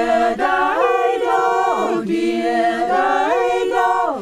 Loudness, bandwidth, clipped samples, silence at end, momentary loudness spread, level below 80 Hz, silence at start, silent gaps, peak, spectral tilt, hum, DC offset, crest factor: -17 LUFS; 14.5 kHz; under 0.1%; 0 s; 2 LU; -52 dBFS; 0 s; none; -4 dBFS; -4.5 dB/octave; none; under 0.1%; 12 dB